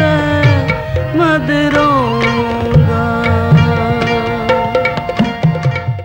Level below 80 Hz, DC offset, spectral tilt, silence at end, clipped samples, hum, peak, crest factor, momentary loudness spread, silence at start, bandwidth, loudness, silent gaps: -32 dBFS; under 0.1%; -7.5 dB/octave; 0 s; under 0.1%; none; 0 dBFS; 12 dB; 5 LU; 0 s; 16.5 kHz; -13 LUFS; none